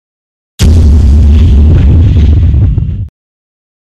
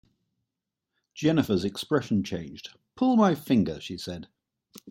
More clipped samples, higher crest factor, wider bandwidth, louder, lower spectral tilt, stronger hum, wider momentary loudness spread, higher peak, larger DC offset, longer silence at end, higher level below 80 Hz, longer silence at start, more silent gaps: neither; second, 6 dB vs 20 dB; second, 9.2 kHz vs 16.5 kHz; first, -7 LUFS vs -26 LUFS; about the same, -7.5 dB/octave vs -6.5 dB/octave; neither; second, 9 LU vs 18 LU; first, 0 dBFS vs -8 dBFS; neither; first, 0.9 s vs 0 s; first, -8 dBFS vs -62 dBFS; second, 0.6 s vs 1.15 s; neither